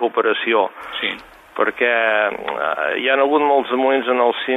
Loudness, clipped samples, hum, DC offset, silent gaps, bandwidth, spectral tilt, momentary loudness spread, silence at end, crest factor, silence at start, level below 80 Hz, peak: -18 LUFS; under 0.1%; none; under 0.1%; none; 13.5 kHz; -4.5 dB/octave; 8 LU; 0 s; 16 dB; 0 s; -62 dBFS; -2 dBFS